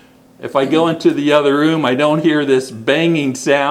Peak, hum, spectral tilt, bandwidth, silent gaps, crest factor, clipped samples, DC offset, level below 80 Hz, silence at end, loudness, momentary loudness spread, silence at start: 0 dBFS; none; -5.5 dB/octave; 14 kHz; none; 14 dB; under 0.1%; under 0.1%; -62 dBFS; 0 s; -14 LUFS; 4 LU; 0.4 s